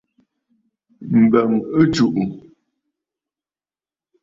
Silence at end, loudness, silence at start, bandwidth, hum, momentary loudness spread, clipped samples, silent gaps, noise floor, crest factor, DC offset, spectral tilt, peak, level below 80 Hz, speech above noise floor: 1.85 s; -17 LUFS; 1 s; 7.6 kHz; none; 11 LU; under 0.1%; none; under -90 dBFS; 18 dB; under 0.1%; -7 dB/octave; -2 dBFS; -54 dBFS; over 74 dB